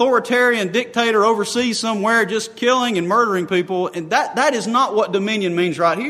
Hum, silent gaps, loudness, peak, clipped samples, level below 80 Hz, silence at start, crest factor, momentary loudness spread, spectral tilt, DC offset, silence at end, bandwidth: none; none; -18 LUFS; -2 dBFS; under 0.1%; -68 dBFS; 0 s; 16 dB; 4 LU; -4 dB/octave; under 0.1%; 0 s; 13.5 kHz